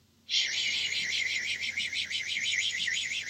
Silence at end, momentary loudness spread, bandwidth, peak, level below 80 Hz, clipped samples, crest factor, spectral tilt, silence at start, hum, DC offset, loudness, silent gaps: 0 s; 3 LU; 16 kHz; -14 dBFS; -72 dBFS; under 0.1%; 18 dB; 2 dB/octave; 0.3 s; none; under 0.1%; -29 LUFS; none